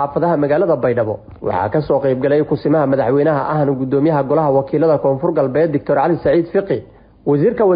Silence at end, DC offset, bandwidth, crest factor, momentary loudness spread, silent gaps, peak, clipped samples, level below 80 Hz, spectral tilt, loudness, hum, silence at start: 0 s; under 0.1%; 5.2 kHz; 10 dB; 5 LU; none; -4 dBFS; under 0.1%; -46 dBFS; -13.5 dB/octave; -16 LUFS; none; 0 s